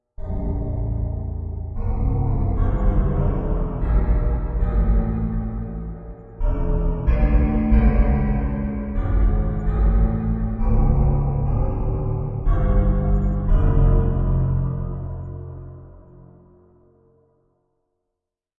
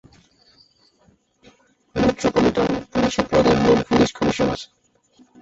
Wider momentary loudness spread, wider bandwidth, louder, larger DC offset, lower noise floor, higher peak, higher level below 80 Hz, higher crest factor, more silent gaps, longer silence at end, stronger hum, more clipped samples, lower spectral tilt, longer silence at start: first, 11 LU vs 7 LU; second, 3 kHz vs 8 kHz; second, -23 LUFS vs -19 LUFS; neither; first, -82 dBFS vs -59 dBFS; about the same, -4 dBFS vs -4 dBFS; first, -22 dBFS vs -44 dBFS; about the same, 16 dB vs 18 dB; neither; first, 2.6 s vs 0.75 s; neither; neither; first, -12 dB/octave vs -5.5 dB/octave; second, 0.2 s vs 1.95 s